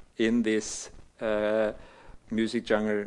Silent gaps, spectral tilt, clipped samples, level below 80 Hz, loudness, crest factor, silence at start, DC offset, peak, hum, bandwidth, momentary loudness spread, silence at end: none; -4.5 dB/octave; under 0.1%; -54 dBFS; -29 LUFS; 18 dB; 0.2 s; under 0.1%; -12 dBFS; none; 11.5 kHz; 11 LU; 0 s